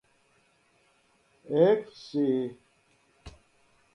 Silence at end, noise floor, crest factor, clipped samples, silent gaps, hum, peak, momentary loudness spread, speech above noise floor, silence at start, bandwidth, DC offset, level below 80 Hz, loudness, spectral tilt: 0.65 s; -67 dBFS; 22 dB; under 0.1%; none; none; -10 dBFS; 11 LU; 41 dB; 1.45 s; 10.5 kHz; under 0.1%; -64 dBFS; -27 LUFS; -8 dB/octave